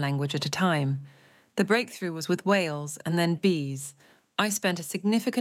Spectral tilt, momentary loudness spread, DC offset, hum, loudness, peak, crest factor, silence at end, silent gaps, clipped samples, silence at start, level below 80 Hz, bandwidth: -5 dB/octave; 9 LU; under 0.1%; none; -27 LUFS; -8 dBFS; 20 dB; 0 s; none; under 0.1%; 0 s; -74 dBFS; 16.5 kHz